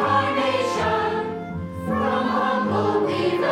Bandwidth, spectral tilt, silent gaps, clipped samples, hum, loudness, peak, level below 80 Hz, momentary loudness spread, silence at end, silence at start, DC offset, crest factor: 15.5 kHz; -6 dB/octave; none; under 0.1%; none; -22 LUFS; -8 dBFS; -52 dBFS; 8 LU; 0 s; 0 s; under 0.1%; 14 dB